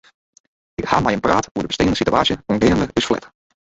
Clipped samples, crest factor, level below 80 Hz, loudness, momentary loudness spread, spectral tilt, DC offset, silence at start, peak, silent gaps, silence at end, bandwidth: under 0.1%; 18 dB; -40 dBFS; -18 LUFS; 8 LU; -5 dB/octave; under 0.1%; 0.8 s; -2 dBFS; 1.51-1.55 s; 0.35 s; 8.2 kHz